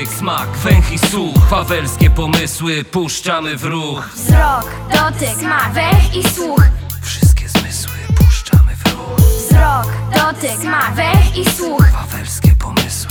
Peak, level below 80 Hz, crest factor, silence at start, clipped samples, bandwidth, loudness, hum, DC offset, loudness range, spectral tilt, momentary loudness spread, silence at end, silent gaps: 0 dBFS; -18 dBFS; 12 dB; 0 s; under 0.1%; over 20 kHz; -14 LUFS; none; under 0.1%; 2 LU; -5 dB/octave; 7 LU; 0 s; none